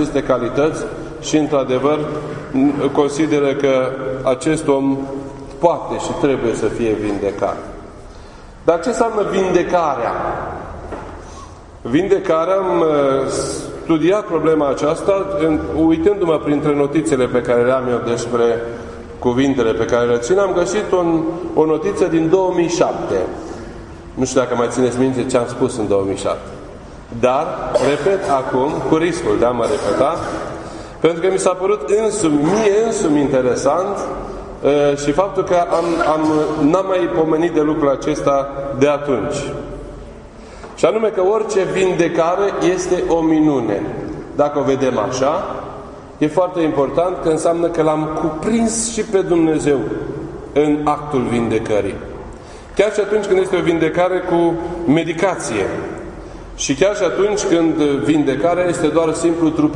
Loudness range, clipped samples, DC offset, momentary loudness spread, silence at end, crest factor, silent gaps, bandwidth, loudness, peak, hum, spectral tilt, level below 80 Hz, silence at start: 3 LU; under 0.1%; under 0.1%; 12 LU; 0 s; 16 dB; none; 11 kHz; -17 LUFS; 0 dBFS; none; -5.5 dB/octave; -40 dBFS; 0 s